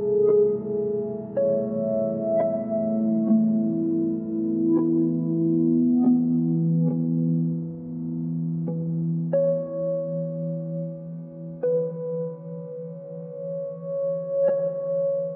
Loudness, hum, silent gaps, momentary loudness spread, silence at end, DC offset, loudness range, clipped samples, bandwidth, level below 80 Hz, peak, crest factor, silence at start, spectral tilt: -25 LUFS; none; none; 12 LU; 0 s; under 0.1%; 8 LU; under 0.1%; 2.1 kHz; -68 dBFS; -10 dBFS; 14 dB; 0 s; -14.5 dB/octave